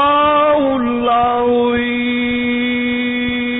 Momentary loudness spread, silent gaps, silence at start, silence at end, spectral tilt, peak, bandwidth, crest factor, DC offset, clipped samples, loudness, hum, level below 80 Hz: 5 LU; none; 0 s; 0 s; -10.5 dB/octave; -4 dBFS; 4 kHz; 10 dB; under 0.1%; under 0.1%; -15 LUFS; none; -42 dBFS